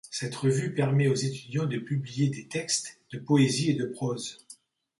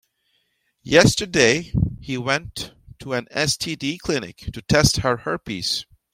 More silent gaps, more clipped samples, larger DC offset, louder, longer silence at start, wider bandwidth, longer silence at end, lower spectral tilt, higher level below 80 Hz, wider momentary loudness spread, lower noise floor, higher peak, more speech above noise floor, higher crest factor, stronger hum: neither; neither; neither; second, -28 LUFS vs -20 LUFS; second, 0.05 s vs 0.85 s; second, 11.5 kHz vs 16.5 kHz; first, 0.45 s vs 0.3 s; first, -5.5 dB/octave vs -4 dB/octave; second, -66 dBFS vs -40 dBFS; second, 11 LU vs 16 LU; second, -55 dBFS vs -69 dBFS; second, -10 dBFS vs 0 dBFS; second, 27 dB vs 48 dB; about the same, 18 dB vs 22 dB; neither